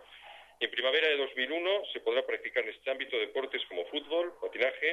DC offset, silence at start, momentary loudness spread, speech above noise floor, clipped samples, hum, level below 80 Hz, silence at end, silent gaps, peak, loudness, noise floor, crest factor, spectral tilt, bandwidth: under 0.1%; 0 s; 9 LU; 21 dB; under 0.1%; none; -78 dBFS; 0 s; none; -14 dBFS; -32 LUFS; -53 dBFS; 18 dB; -2.5 dB/octave; 10.5 kHz